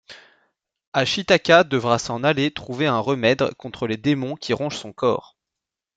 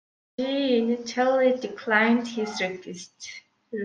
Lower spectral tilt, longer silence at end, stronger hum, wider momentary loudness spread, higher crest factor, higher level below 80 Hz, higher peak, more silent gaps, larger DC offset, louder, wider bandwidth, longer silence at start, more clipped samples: about the same, -5 dB/octave vs -4 dB/octave; first, 0.75 s vs 0 s; neither; second, 10 LU vs 19 LU; about the same, 20 dB vs 18 dB; first, -58 dBFS vs -74 dBFS; first, -2 dBFS vs -6 dBFS; first, 0.87-0.92 s vs none; neither; first, -21 LUFS vs -24 LUFS; about the same, 9.2 kHz vs 9.2 kHz; second, 0.1 s vs 0.4 s; neither